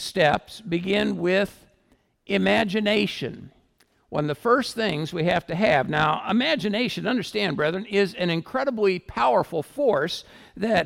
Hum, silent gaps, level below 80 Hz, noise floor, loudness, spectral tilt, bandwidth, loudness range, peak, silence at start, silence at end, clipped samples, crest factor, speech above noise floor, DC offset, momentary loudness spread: none; none; -54 dBFS; -64 dBFS; -24 LUFS; -5.5 dB/octave; 16 kHz; 2 LU; -6 dBFS; 0 s; 0 s; under 0.1%; 18 dB; 41 dB; under 0.1%; 8 LU